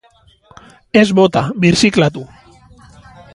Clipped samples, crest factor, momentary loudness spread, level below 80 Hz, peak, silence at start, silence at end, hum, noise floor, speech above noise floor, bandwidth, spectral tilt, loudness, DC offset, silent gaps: under 0.1%; 16 dB; 6 LU; -46 dBFS; 0 dBFS; 0.95 s; 1.1 s; none; -51 dBFS; 39 dB; 11.5 kHz; -5.5 dB/octave; -13 LUFS; under 0.1%; none